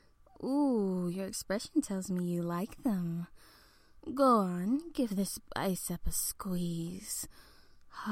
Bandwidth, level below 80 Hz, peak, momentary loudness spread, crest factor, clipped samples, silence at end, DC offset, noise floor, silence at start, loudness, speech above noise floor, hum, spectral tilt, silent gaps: 16.5 kHz; -54 dBFS; -16 dBFS; 12 LU; 18 dB; under 0.1%; 0 s; under 0.1%; -60 dBFS; 0.4 s; -34 LUFS; 27 dB; none; -5.5 dB/octave; none